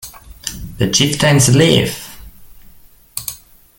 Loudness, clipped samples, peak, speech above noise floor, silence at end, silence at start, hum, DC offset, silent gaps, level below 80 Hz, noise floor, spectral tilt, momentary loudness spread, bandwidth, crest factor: -13 LUFS; under 0.1%; 0 dBFS; 31 dB; 0.4 s; 0.05 s; none; under 0.1%; none; -40 dBFS; -43 dBFS; -4 dB/octave; 19 LU; 17 kHz; 16 dB